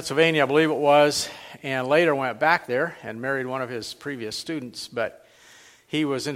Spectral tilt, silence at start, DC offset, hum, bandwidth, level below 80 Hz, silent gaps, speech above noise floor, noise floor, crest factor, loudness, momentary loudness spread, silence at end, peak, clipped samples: -4 dB/octave; 0 s; under 0.1%; none; 16 kHz; -66 dBFS; none; 28 dB; -52 dBFS; 20 dB; -23 LUFS; 14 LU; 0 s; -4 dBFS; under 0.1%